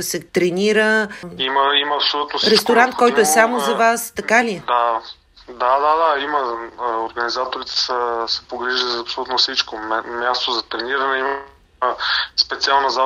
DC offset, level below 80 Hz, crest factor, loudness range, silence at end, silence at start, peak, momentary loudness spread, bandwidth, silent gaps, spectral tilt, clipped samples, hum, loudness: under 0.1%; -56 dBFS; 18 dB; 5 LU; 0 s; 0 s; 0 dBFS; 9 LU; 16 kHz; none; -2 dB/octave; under 0.1%; none; -18 LUFS